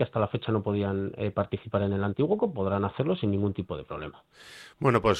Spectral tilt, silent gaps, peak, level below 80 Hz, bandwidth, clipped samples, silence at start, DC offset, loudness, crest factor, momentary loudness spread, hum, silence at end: -8 dB/octave; none; -10 dBFS; -54 dBFS; 9.6 kHz; under 0.1%; 0 s; under 0.1%; -29 LUFS; 18 dB; 12 LU; none; 0 s